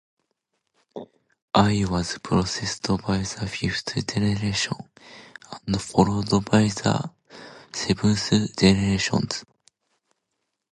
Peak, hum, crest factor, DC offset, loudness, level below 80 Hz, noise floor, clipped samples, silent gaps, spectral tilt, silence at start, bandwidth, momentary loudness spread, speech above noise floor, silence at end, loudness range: -2 dBFS; none; 22 dB; under 0.1%; -23 LUFS; -46 dBFS; -79 dBFS; under 0.1%; 1.42-1.48 s; -5 dB/octave; 0.95 s; 11.5 kHz; 21 LU; 56 dB; 1.3 s; 3 LU